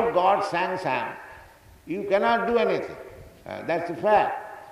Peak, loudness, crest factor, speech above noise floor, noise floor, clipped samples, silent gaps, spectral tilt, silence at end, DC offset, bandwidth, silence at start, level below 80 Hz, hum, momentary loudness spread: -8 dBFS; -25 LUFS; 16 dB; 26 dB; -50 dBFS; under 0.1%; none; -5.5 dB/octave; 0 s; under 0.1%; 14.5 kHz; 0 s; -58 dBFS; none; 20 LU